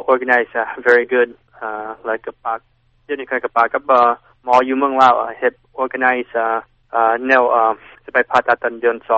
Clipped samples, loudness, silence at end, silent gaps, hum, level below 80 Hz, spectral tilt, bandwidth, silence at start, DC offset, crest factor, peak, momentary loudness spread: under 0.1%; -17 LUFS; 0 s; none; none; -58 dBFS; -1 dB/octave; 8 kHz; 0 s; under 0.1%; 16 dB; 0 dBFS; 13 LU